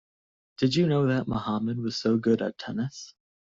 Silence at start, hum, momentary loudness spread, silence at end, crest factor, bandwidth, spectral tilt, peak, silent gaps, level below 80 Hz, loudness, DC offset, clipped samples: 0.6 s; none; 10 LU; 0.4 s; 16 dB; 7.6 kHz; -6.5 dB/octave; -10 dBFS; none; -60 dBFS; -27 LUFS; under 0.1%; under 0.1%